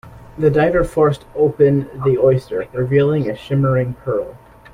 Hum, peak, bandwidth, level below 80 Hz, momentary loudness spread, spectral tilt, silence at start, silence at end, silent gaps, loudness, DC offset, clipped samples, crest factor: none; -2 dBFS; 11.5 kHz; -40 dBFS; 8 LU; -9 dB/octave; 0.05 s; 0.4 s; none; -17 LUFS; under 0.1%; under 0.1%; 14 dB